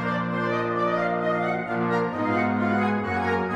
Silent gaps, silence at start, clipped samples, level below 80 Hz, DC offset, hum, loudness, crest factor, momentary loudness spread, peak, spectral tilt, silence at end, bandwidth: none; 0 s; under 0.1%; -58 dBFS; under 0.1%; none; -25 LUFS; 12 dB; 2 LU; -12 dBFS; -7.5 dB/octave; 0 s; 9.4 kHz